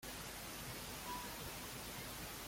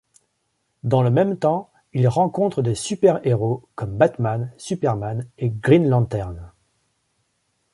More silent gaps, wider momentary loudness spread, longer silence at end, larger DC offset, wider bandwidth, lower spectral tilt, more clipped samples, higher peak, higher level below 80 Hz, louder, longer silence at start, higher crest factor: neither; second, 2 LU vs 11 LU; second, 0 s vs 1.25 s; neither; first, 16.5 kHz vs 11.5 kHz; second, -2.5 dB/octave vs -7.5 dB/octave; neither; second, -34 dBFS vs -2 dBFS; second, -60 dBFS vs -50 dBFS; second, -47 LUFS vs -21 LUFS; second, 0 s vs 0.85 s; about the same, 14 dB vs 18 dB